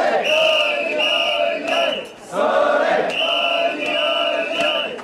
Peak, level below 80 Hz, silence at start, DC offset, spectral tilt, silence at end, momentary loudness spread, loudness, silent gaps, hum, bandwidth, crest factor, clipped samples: -6 dBFS; -64 dBFS; 0 s; under 0.1%; -2 dB/octave; 0 s; 4 LU; -18 LUFS; none; none; 13 kHz; 12 dB; under 0.1%